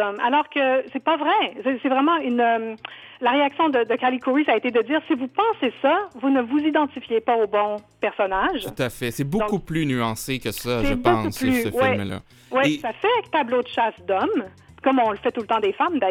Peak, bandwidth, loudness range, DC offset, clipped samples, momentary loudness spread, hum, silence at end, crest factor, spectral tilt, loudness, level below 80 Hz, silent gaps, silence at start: -4 dBFS; 17.5 kHz; 2 LU; under 0.1%; under 0.1%; 6 LU; none; 0 s; 18 dB; -5.5 dB/octave; -22 LUFS; -46 dBFS; none; 0 s